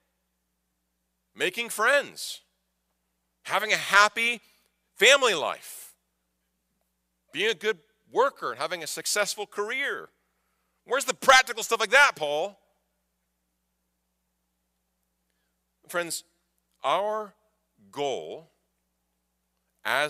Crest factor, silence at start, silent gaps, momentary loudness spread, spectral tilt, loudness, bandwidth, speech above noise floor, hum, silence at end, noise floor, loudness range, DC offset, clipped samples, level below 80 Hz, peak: 24 dB; 1.4 s; none; 19 LU; -0.5 dB/octave; -24 LUFS; 15.5 kHz; 52 dB; none; 0 s; -78 dBFS; 10 LU; under 0.1%; under 0.1%; -70 dBFS; -4 dBFS